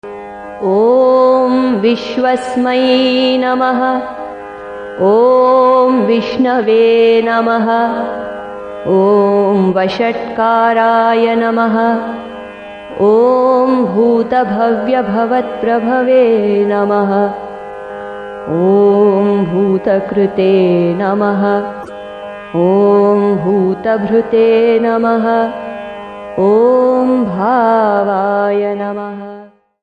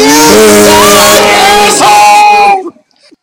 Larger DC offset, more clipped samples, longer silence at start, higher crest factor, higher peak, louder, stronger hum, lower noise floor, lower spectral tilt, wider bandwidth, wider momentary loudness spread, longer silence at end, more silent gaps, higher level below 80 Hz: neither; second, under 0.1% vs 20%; about the same, 0.05 s vs 0 s; first, 12 dB vs 4 dB; about the same, 0 dBFS vs 0 dBFS; second, -12 LUFS vs -2 LUFS; neither; second, -36 dBFS vs -42 dBFS; first, -7.5 dB/octave vs -2 dB/octave; second, 9.4 kHz vs over 20 kHz; first, 16 LU vs 3 LU; second, 0.35 s vs 0.5 s; neither; second, -50 dBFS vs -32 dBFS